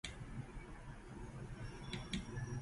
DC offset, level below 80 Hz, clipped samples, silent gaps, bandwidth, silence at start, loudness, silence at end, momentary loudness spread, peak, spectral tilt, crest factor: under 0.1%; -54 dBFS; under 0.1%; none; 11.5 kHz; 0.05 s; -49 LUFS; 0 s; 9 LU; -26 dBFS; -5 dB/octave; 22 dB